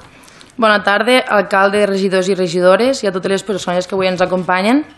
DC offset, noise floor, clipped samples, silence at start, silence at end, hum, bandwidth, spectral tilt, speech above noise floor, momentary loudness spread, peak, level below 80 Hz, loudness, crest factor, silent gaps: under 0.1%; -41 dBFS; under 0.1%; 0.6 s; 0.1 s; none; 12.5 kHz; -4.5 dB/octave; 28 dB; 6 LU; 0 dBFS; -54 dBFS; -14 LUFS; 14 dB; none